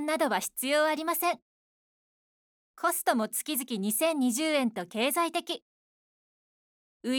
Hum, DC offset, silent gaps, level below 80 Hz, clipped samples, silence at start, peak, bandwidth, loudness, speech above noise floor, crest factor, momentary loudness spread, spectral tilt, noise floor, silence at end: none; under 0.1%; 1.42-2.74 s, 5.62-7.00 s; -82 dBFS; under 0.1%; 0 s; -12 dBFS; over 20 kHz; -29 LUFS; over 61 dB; 18 dB; 6 LU; -2.5 dB/octave; under -90 dBFS; 0 s